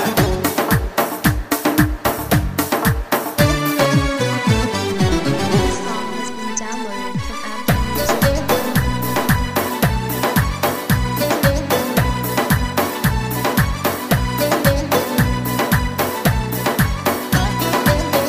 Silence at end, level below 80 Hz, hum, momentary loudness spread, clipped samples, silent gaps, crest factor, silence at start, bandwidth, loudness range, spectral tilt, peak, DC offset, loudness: 0 s; -28 dBFS; none; 5 LU; under 0.1%; none; 16 dB; 0 s; 15.5 kHz; 3 LU; -5 dB/octave; -2 dBFS; under 0.1%; -18 LUFS